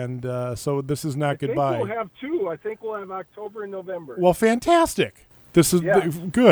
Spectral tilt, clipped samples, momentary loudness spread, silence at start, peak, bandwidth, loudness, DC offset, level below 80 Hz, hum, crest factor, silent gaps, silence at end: -5.5 dB/octave; under 0.1%; 15 LU; 0 s; -2 dBFS; over 20 kHz; -23 LUFS; under 0.1%; -52 dBFS; none; 20 dB; none; 0 s